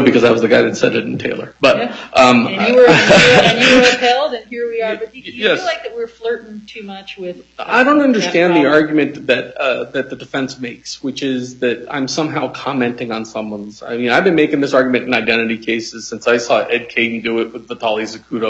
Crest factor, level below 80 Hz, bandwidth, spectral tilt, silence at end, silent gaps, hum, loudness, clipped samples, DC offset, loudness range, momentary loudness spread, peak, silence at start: 14 dB; -50 dBFS; 8.4 kHz; -4.5 dB/octave; 0 s; none; none; -14 LUFS; under 0.1%; under 0.1%; 10 LU; 17 LU; 0 dBFS; 0 s